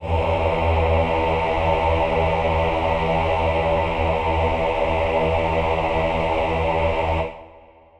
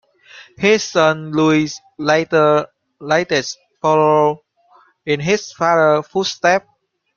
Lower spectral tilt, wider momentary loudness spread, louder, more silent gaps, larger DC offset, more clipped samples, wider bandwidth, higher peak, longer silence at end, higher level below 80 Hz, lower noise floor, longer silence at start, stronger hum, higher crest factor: first, -7 dB/octave vs -4.5 dB/octave; second, 2 LU vs 10 LU; second, -21 LUFS vs -16 LUFS; neither; neither; neither; first, 8.6 kHz vs 7.2 kHz; second, -6 dBFS vs 0 dBFS; second, 0.4 s vs 0.6 s; first, -30 dBFS vs -58 dBFS; second, -48 dBFS vs -53 dBFS; second, 0 s vs 0.35 s; neither; about the same, 14 dB vs 16 dB